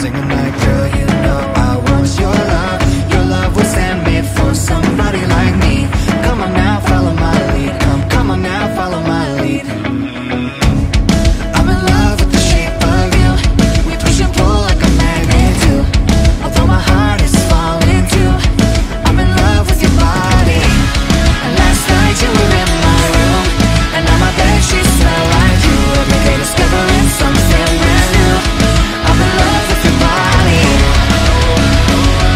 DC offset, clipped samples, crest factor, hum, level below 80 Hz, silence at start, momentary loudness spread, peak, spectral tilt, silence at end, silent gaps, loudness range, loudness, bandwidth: under 0.1%; under 0.1%; 10 dB; none; -14 dBFS; 0 s; 4 LU; 0 dBFS; -5 dB/octave; 0 s; none; 3 LU; -11 LUFS; 16 kHz